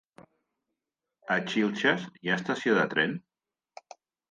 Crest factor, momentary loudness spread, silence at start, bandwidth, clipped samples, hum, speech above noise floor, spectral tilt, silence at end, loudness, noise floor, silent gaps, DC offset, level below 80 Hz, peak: 22 dB; 6 LU; 0.2 s; 9.4 kHz; under 0.1%; none; 60 dB; -5 dB/octave; 1.1 s; -28 LUFS; -87 dBFS; none; under 0.1%; -78 dBFS; -10 dBFS